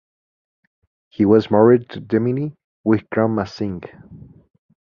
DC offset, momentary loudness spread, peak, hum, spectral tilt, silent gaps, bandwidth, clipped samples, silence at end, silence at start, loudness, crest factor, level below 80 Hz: under 0.1%; 16 LU; -2 dBFS; none; -9 dB/octave; 2.64-2.84 s; 6.8 kHz; under 0.1%; 0.7 s; 1.2 s; -18 LUFS; 18 dB; -52 dBFS